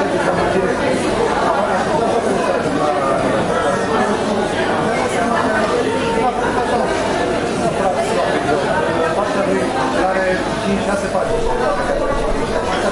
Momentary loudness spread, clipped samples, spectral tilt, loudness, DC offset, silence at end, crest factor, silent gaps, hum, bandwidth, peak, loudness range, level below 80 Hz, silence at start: 2 LU; under 0.1%; -5 dB/octave; -17 LUFS; under 0.1%; 0 s; 14 dB; none; none; 11.5 kHz; -2 dBFS; 1 LU; -34 dBFS; 0 s